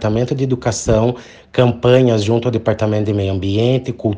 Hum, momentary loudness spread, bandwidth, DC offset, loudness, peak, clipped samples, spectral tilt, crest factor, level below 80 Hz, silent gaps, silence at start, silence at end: none; 6 LU; 9.8 kHz; under 0.1%; -16 LUFS; 0 dBFS; under 0.1%; -6.5 dB/octave; 16 dB; -38 dBFS; none; 0 s; 0 s